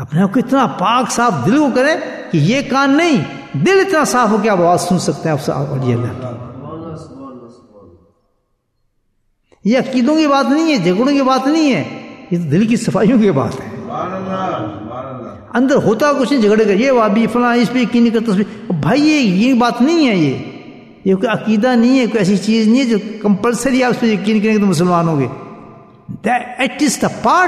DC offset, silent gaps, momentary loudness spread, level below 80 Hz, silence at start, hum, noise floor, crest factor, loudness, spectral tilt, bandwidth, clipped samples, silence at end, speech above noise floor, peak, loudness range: under 0.1%; none; 14 LU; -52 dBFS; 0 s; none; -64 dBFS; 14 dB; -14 LUFS; -5.5 dB/octave; 13.5 kHz; under 0.1%; 0 s; 51 dB; -2 dBFS; 6 LU